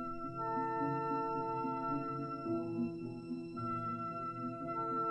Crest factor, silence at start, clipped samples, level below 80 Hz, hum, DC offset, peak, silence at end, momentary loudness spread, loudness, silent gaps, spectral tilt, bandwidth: 14 dB; 0 s; under 0.1%; -66 dBFS; none; under 0.1%; -24 dBFS; 0 s; 6 LU; -39 LUFS; none; -9 dB/octave; 9.6 kHz